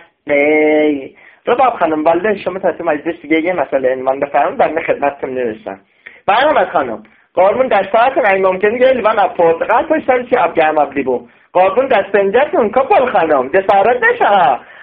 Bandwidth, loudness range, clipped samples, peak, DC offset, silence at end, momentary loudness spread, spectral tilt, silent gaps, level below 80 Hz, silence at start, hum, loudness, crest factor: 5 kHz; 4 LU; under 0.1%; 0 dBFS; under 0.1%; 0 s; 9 LU; -2.5 dB/octave; none; -54 dBFS; 0.25 s; none; -13 LUFS; 14 dB